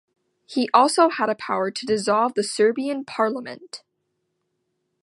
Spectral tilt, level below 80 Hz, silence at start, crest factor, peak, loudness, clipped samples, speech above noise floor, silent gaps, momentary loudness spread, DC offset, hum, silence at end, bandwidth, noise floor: -3.5 dB/octave; -70 dBFS; 0.5 s; 22 dB; -2 dBFS; -21 LUFS; under 0.1%; 54 dB; none; 16 LU; under 0.1%; none; 1.25 s; 11.5 kHz; -75 dBFS